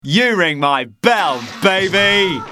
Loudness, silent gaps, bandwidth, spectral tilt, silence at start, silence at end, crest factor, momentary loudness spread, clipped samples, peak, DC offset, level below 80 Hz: -14 LUFS; none; 15.5 kHz; -4 dB/octave; 0.05 s; 0 s; 16 dB; 5 LU; under 0.1%; 0 dBFS; under 0.1%; -54 dBFS